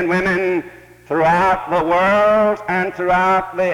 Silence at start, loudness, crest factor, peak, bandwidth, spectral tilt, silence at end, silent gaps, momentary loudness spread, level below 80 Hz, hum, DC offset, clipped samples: 0 s; -16 LUFS; 10 dB; -6 dBFS; 16.5 kHz; -6.5 dB/octave; 0 s; none; 7 LU; -46 dBFS; none; under 0.1%; under 0.1%